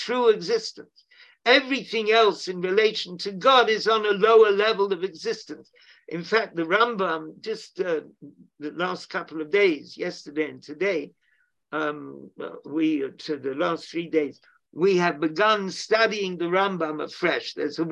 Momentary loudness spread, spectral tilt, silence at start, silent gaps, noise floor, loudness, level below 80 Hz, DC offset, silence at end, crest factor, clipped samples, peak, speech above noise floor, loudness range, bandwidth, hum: 15 LU; -4.5 dB/octave; 0 s; none; -69 dBFS; -24 LUFS; -76 dBFS; under 0.1%; 0 s; 20 dB; under 0.1%; -4 dBFS; 44 dB; 8 LU; 9 kHz; none